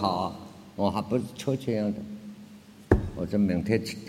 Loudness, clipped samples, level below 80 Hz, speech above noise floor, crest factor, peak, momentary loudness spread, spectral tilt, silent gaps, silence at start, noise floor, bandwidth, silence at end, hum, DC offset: -28 LUFS; under 0.1%; -42 dBFS; 21 dB; 24 dB; -6 dBFS; 17 LU; -7 dB/octave; none; 0 s; -49 dBFS; 15.5 kHz; 0 s; none; under 0.1%